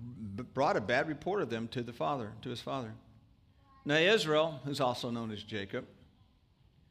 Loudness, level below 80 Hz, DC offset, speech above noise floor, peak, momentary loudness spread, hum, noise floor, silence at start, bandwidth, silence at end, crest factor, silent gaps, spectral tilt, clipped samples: -33 LUFS; -68 dBFS; under 0.1%; 33 dB; -16 dBFS; 14 LU; none; -66 dBFS; 0 s; 15.5 kHz; 1 s; 20 dB; none; -5 dB/octave; under 0.1%